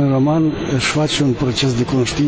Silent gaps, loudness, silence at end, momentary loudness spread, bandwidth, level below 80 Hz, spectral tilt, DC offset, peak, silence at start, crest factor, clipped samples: none; -17 LUFS; 0 s; 3 LU; 8 kHz; -38 dBFS; -5.5 dB/octave; under 0.1%; -4 dBFS; 0 s; 12 dB; under 0.1%